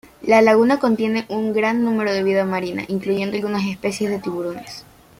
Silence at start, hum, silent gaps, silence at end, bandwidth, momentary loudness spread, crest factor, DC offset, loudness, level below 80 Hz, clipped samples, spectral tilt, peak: 0.2 s; none; none; 0.35 s; 16 kHz; 12 LU; 18 dB; under 0.1%; -19 LUFS; -58 dBFS; under 0.1%; -6 dB/octave; -2 dBFS